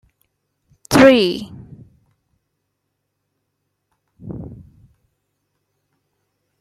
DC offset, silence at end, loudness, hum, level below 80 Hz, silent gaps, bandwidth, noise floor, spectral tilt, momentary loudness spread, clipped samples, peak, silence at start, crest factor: under 0.1%; 2.05 s; -13 LUFS; none; -50 dBFS; none; 15 kHz; -74 dBFS; -5 dB/octave; 25 LU; under 0.1%; -2 dBFS; 0.9 s; 20 dB